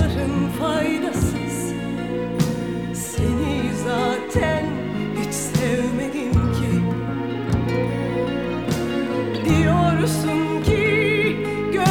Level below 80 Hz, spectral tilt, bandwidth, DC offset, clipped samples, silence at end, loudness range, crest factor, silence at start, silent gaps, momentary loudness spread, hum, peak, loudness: -36 dBFS; -6 dB/octave; 18.5 kHz; 0.3%; under 0.1%; 0 s; 3 LU; 16 dB; 0 s; none; 8 LU; none; -4 dBFS; -22 LUFS